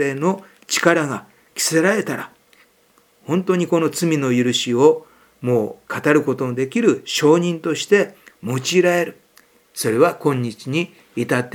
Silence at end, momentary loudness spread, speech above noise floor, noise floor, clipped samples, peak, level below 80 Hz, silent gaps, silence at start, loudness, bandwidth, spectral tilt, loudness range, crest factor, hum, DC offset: 0.05 s; 11 LU; 39 dB; -57 dBFS; under 0.1%; 0 dBFS; -70 dBFS; none; 0 s; -19 LUFS; 19.5 kHz; -4.5 dB/octave; 3 LU; 20 dB; none; under 0.1%